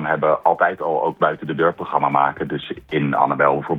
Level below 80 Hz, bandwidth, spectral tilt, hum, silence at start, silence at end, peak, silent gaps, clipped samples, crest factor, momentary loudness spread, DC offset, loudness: -56 dBFS; 4.9 kHz; -8.5 dB/octave; none; 0 s; 0 s; 0 dBFS; none; under 0.1%; 18 dB; 8 LU; under 0.1%; -19 LUFS